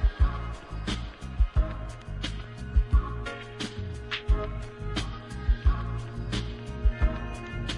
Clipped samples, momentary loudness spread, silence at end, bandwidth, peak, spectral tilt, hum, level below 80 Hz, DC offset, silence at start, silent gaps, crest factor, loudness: under 0.1%; 10 LU; 0 s; 10.5 kHz; -12 dBFS; -6 dB/octave; none; -30 dBFS; under 0.1%; 0 s; none; 18 dB; -32 LUFS